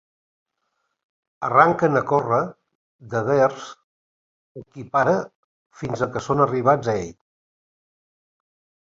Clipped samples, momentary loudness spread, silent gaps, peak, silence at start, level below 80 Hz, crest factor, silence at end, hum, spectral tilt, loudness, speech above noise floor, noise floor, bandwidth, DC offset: under 0.1%; 20 LU; 2.75-2.99 s, 3.84-4.55 s, 5.35-5.70 s; -2 dBFS; 1.4 s; -58 dBFS; 22 dB; 1.8 s; none; -7 dB/octave; -21 LUFS; 54 dB; -75 dBFS; 7.8 kHz; under 0.1%